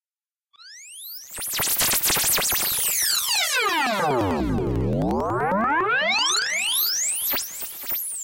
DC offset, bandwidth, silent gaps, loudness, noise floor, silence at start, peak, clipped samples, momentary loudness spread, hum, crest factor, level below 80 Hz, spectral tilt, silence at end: under 0.1%; 17 kHz; none; -21 LUFS; under -90 dBFS; 0.6 s; -10 dBFS; under 0.1%; 11 LU; none; 14 dB; -44 dBFS; -2 dB/octave; 0 s